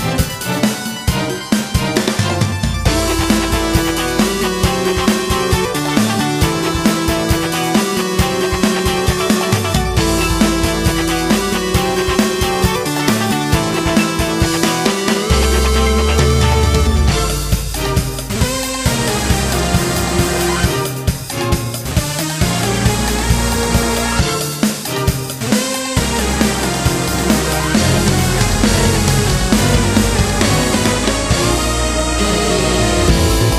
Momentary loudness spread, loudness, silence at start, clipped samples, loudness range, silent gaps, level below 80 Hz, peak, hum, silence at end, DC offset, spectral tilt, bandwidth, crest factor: 5 LU; -15 LUFS; 0 s; under 0.1%; 3 LU; none; -22 dBFS; 0 dBFS; none; 0 s; under 0.1%; -4.5 dB/octave; 15.5 kHz; 14 dB